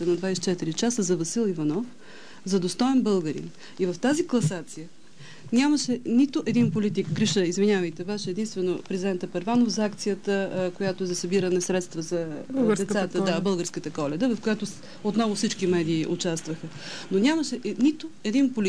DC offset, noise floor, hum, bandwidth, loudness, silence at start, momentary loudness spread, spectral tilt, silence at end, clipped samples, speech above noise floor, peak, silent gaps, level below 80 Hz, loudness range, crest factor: 0.7%; -47 dBFS; none; 11 kHz; -26 LUFS; 0 s; 9 LU; -5 dB/octave; 0 s; under 0.1%; 22 dB; -12 dBFS; none; -66 dBFS; 2 LU; 14 dB